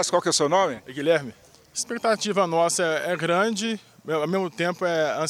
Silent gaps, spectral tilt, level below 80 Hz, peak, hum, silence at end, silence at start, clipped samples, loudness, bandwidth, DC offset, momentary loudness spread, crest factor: none; -3.5 dB/octave; -68 dBFS; -8 dBFS; none; 0 s; 0 s; under 0.1%; -24 LUFS; 16 kHz; under 0.1%; 8 LU; 16 dB